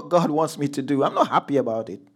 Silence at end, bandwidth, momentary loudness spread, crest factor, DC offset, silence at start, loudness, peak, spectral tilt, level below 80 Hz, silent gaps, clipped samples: 0.2 s; 15 kHz; 7 LU; 18 dB; under 0.1%; 0 s; -22 LUFS; -4 dBFS; -6 dB/octave; -76 dBFS; none; under 0.1%